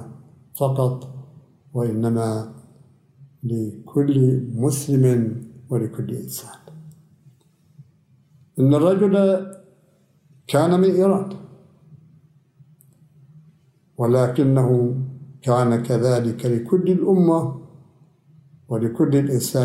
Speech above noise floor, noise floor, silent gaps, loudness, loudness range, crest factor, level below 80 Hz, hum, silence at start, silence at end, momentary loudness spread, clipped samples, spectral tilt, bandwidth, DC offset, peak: 40 dB; -59 dBFS; none; -20 LUFS; 7 LU; 16 dB; -64 dBFS; none; 0 s; 0 s; 16 LU; under 0.1%; -7.5 dB/octave; 16 kHz; under 0.1%; -4 dBFS